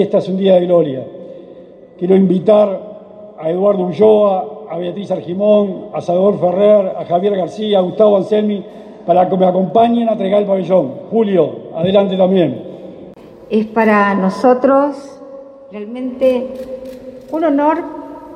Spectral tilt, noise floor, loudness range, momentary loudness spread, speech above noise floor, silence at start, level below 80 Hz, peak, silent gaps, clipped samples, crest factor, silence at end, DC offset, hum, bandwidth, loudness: -8 dB/octave; -38 dBFS; 2 LU; 19 LU; 24 dB; 0 s; -58 dBFS; 0 dBFS; none; under 0.1%; 14 dB; 0 s; under 0.1%; none; 9.2 kHz; -14 LUFS